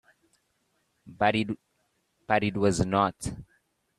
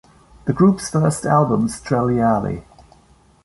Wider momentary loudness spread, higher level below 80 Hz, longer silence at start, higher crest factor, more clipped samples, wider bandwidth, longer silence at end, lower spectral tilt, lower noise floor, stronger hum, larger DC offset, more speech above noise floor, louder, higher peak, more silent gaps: about the same, 13 LU vs 11 LU; second, -54 dBFS vs -46 dBFS; first, 1.05 s vs 0.45 s; first, 22 dB vs 16 dB; neither; first, 13 kHz vs 11.5 kHz; second, 0.55 s vs 0.85 s; second, -5.5 dB/octave vs -7 dB/octave; first, -74 dBFS vs -52 dBFS; neither; neither; first, 48 dB vs 35 dB; second, -27 LUFS vs -18 LUFS; second, -8 dBFS vs -2 dBFS; neither